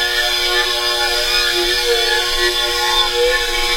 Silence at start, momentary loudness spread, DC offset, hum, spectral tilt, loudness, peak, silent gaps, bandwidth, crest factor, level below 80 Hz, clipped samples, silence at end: 0 s; 1 LU; under 0.1%; none; -0.5 dB/octave; -14 LUFS; -2 dBFS; none; 16.5 kHz; 14 dB; -32 dBFS; under 0.1%; 0 s